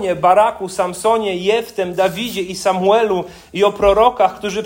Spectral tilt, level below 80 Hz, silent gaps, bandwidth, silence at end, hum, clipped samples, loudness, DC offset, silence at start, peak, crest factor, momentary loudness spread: -4.5 dB/octave; -42 dBFS; none; 16.5 kHz; 0 s; none; under 0.1%; -16 LUFS; under 0.1%; 0 s; 0 dBFS; 16 dB; 9 LU